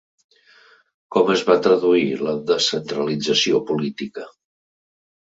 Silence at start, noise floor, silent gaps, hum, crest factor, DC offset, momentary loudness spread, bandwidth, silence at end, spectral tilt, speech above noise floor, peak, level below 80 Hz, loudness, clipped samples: 1.1 s; -53 dBFS; none; none; 20 dB; under 0.1%; 13 LU; 7.8 kHz; 1.1 s; -4 dB/octave; 34 dB; -2 dBFS; -64 dBFS; -19 LUFS; under 0.1%